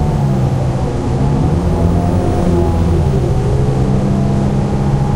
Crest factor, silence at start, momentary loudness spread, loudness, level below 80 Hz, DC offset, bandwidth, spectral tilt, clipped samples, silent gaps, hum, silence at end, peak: 12 dB; 0 s; 2 LU; -14 LUFS; -20 dBFS; under 0.1%; 11.5 kHz; -8.5 dB/octave; under 0.1%; none; none; 0 s; -2 dBFS